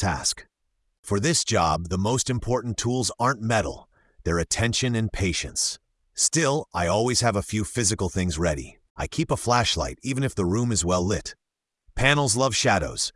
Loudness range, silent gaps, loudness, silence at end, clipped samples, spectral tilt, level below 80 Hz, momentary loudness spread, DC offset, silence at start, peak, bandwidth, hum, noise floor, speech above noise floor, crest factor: 2 LU; 0.99-1.03 s, 8.90-8.95 s; -24 LUFS; 0.05 s; under 0.1%; -3.5 dB/octave; -42 dBFS; 11 LU; under 0.1%; 0 s; -4 dBFS; 12 kHz; none; -74 dBFS; 50 dB; 20 dB